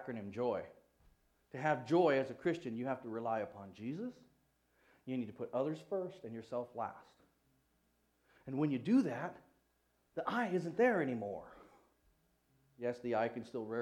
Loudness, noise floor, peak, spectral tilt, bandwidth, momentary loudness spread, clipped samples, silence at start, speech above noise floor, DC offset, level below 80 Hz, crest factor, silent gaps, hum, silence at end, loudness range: -38 LUFS; -78 dBFS; -20 dBFS; -7.5 dB/octave; 11.5 kHz; 15 LU; under 0.1%; 0 s; 40 dB; under 0.1%; -78 dBFS; 20 dB; none; 60 Hz at -75 dBFS; 0 s; 7 LU